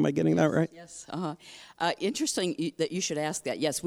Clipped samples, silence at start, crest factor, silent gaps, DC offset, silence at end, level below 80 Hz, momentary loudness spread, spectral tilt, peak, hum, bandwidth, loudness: under 0.1%; 0 s; 20 dB; none; under 0.1%; 0 s; -68 dBFS; 13 LU; -4.5 dB/octave; -10 dBFS; none; 16 kHz; -29 LUFS